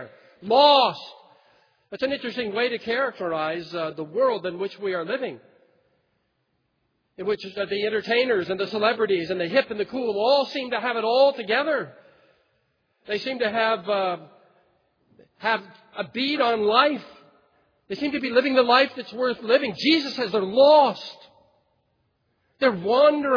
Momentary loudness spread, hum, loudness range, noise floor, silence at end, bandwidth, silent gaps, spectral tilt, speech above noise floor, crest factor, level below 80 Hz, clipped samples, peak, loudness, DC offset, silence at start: 12 LU; none; 7 LU; -73 dBFS; 0 s; 5.4 kHz; none; -5.5 dB/octave; 50 dB; 20 dB; -70 dBFS; under 0.1%; -4 dBFS; -23 LUFS; under 0.1%; 0 s